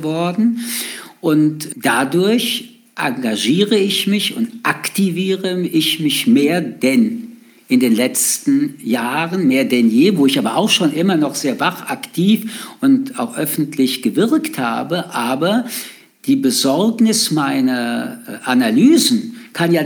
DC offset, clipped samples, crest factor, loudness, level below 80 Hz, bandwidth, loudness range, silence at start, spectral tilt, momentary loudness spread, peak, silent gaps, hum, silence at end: under 0.1%; under 0.1%; 14 dB; -16 LUFS; -70 dBFS; over 20 kHz; 3 LU; 0 s; -4 dB/octave; 9 LU; -2 dBFS; none; none; 0 s